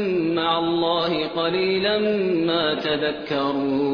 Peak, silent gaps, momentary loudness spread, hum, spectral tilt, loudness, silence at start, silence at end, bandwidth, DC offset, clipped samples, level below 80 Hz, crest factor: -8 dBFS; none; 3 LU; none; -7 dB/octave; -22 LUFS; 0 s; 0 s; 5.4 kHz; under 0.1%; under 0.1%; -58 dBFS; 14 dB